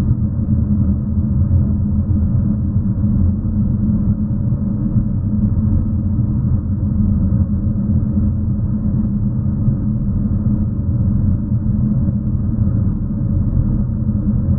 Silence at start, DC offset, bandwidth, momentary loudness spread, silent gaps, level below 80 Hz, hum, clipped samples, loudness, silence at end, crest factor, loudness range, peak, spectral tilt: 0 s; under 0.1%; 1.8 kHz; 3 LU; none; -24 dBFS; none; under 0.1%; -17 LUFS; 0 s; 14 dB; 1 LU; -2 dBFS; -16.5 dB/octave